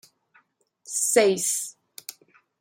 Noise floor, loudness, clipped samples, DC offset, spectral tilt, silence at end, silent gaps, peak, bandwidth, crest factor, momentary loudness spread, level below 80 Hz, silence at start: -63 dBFS; -22 LUFS; under 0.1%; under 0.1%; -2 dB/octave; 0.5 s; none; -6 dBFS; 16.5 kHz; 22 dB; 21 LU; -78 dBFS; 0.85 s